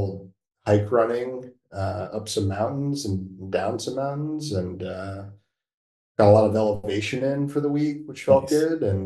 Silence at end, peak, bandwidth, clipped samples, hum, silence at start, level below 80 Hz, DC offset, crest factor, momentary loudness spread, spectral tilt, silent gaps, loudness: 0 s; -4 dBFS; 12.5 kHz; under 0.1%; none; 0 s; -58 dBFS; under 0.1%; 20 dB; 14 LU; -6.5 dB/octave; 5.74-6.15 s; -24 LUFS